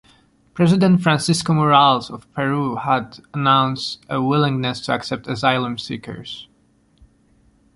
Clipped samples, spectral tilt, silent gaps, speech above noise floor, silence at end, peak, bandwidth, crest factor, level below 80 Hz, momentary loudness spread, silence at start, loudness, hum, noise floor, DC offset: under 0.1%; -5.5 dB/octave; none; 40 dB; 1.3 s; -2 dBFS; 11.5 kHz; 18 dB; -54 dBFS; 16 LU; 0.55 s; -18 LUFS; none; -58 dBFS; under 0.1%